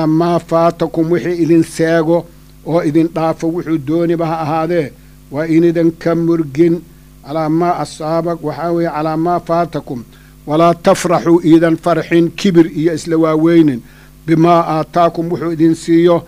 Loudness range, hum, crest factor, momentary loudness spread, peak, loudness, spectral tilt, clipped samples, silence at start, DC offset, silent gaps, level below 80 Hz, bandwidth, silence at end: 4 LU; none; 14 dB; 9 LU; 0 dBFS; -14 LUFS; -7 dB/octave; under 0.1%; 0 s; under 0.1%; none; -44 dBFS; 15 kHz; 0 s